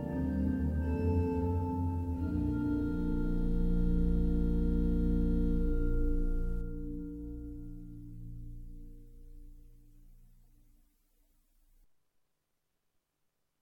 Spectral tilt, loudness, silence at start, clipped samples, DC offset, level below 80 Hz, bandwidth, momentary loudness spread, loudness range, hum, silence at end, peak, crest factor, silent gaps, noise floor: -10.5 dB/octave; -34 LUFS; 0 s; under 0.1%; under 0.1%; -36 dBFS; 4.3 kHz; 17 LU; 18 LU; none; 3.5 s; -18 dBFS; 14 dB; none; -81 dBFS